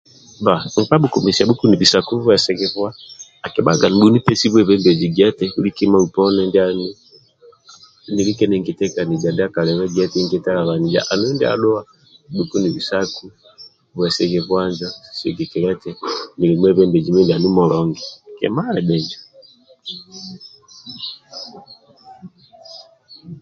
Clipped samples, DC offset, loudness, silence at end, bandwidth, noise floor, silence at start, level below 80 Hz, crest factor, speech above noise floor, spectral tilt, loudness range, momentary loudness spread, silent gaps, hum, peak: under 0.1%; under 0.1%; -17 LUFS; 0.05 s; 8 kHz; -49 dBFS; 0.4 s; -50 dBFS; 18 dB; 32 dB; -5.5 dB/octave; 10 LU; 19 LU; none; none; 0 dBFS